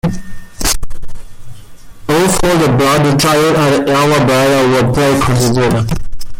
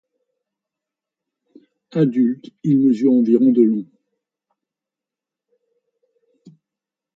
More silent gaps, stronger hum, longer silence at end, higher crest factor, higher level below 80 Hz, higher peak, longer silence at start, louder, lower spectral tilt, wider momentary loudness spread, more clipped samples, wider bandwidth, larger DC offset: neither; neither; second, 0 s vs 3.35 s; second, 10 dB vs 18 dB; first, -26 dBFS vs -72 dBFS; about the same, -2 dBFS vs -2 dBFS; second, 0.05 s vs 1.95 s; first, -11 LUFS vs -17 LUFS; second, -5 dB/octave vs -10 dB/octave; about the same, 10 LU vs 11 LU; neither; first, 17 kHz vs 5.8 kHz; neither